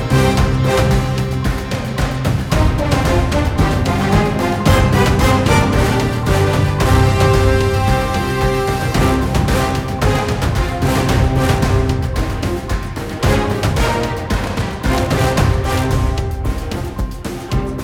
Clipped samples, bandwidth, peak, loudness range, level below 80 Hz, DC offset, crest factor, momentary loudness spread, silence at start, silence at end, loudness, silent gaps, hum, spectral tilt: under 0.1%; 17 kHz; 0 dBFS; 4 LU; -22 dBFS; under 0.1%; 14 dB; 8 LU; 0 s; 0 s; -16 LUFS; none; none; -6 dB/octave